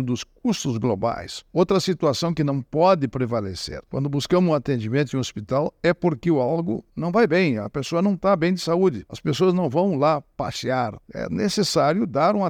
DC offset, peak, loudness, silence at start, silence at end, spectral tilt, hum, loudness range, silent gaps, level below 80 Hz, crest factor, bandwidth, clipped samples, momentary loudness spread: under 0.1%; -6 dBFS; -22 LUFS; 0 s; 0 s; -6 dB/octave; none; 1 LU; none; -52 dBFS; 16 dB; 15.5 kHz; under 0.1%; 8 LU